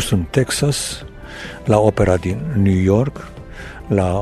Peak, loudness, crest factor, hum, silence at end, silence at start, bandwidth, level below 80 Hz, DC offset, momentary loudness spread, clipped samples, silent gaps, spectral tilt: 0 dBFS; -17 LUFS; 18 dB; none; 0 s; 0 s; 14 kHz; -36 dBFS; under 0.1%; 19 LU; under 0.1%; none; -6 dB/octave